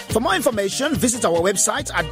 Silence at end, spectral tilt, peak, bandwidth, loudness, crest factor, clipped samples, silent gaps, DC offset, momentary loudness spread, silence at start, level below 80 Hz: 0 s; -3 dB/octave; -4 dBFS; 16 kHz; -19 LUFS; 16 dB; under 0.1%; none; under 0.1%; 4 LU; 0 s; -42 dBFS